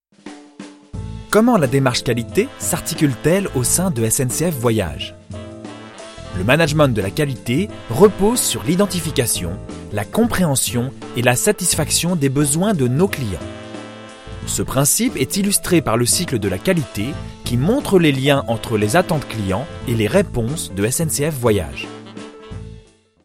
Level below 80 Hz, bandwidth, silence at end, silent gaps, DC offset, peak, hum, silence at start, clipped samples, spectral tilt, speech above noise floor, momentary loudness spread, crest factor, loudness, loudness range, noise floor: -38 dBFS; 16.5 kHz; 0.45 s; none; under 0.1%; 0 dBFS; none; 0.25 s; under 0.1%; -4.5 dB/octave; 28 dB; 19 LU; 18 dB; -18 LUFS; 3 LU; -45 dBFS